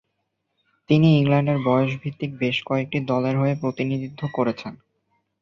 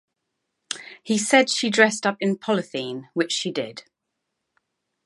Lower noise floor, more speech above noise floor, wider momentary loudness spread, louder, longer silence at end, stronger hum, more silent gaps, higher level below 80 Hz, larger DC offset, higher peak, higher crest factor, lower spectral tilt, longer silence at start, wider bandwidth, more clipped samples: second, -76 dBFS vs -80 dBFS; second, 54 dB vs 58 dB; second, 12 LU vs 16 LU; about the same, -22 LUFS vs -22 LUFS; second, 0.65 s vs 1.25 s; neither; neither; first, -60 dBFS vs -78 dBFS; neither; second, -6 dBFS vs -2 dBFS; second, 18 dB vs 24 dB; first, -8.5 dB/octave vs -3 dB/octave; first, 0.9 s vs 0.7 s; second, 6.8 kHz vs 11.5 kHz; neither